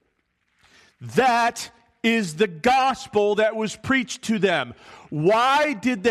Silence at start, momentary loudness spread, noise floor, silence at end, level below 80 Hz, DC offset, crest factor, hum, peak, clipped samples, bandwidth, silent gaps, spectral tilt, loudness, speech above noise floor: 1 s; 10 LU; -71 dBFS; 0 s; -60 dBFS; under 0.1%; 16 dB; none; -6 dBFS; under 0.1%; 13.5 kHz; none; -4.5 dB/octave; -21 LUFS; 49 dB